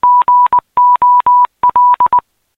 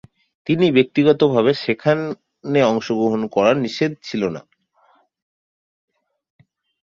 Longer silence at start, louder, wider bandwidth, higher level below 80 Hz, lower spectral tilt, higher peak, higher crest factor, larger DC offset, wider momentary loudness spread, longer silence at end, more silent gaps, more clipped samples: second, 0.05 s vs 0.45 s; first, -9 LUFS vs -18 LUFS; second, 3.9 kHz vs 7.2 kHz; first, -52 dBFS vs -60 dBFS; about the same, -5.5 dB/octave vs -6.5 dB/octave; about the same, -2 dBFS vs -2 dBFS; second, 6 dB vs 18 dB; neither; second, 3 LU vs 10 LU; second, 0.35 s vs 2.5 s; neither; neither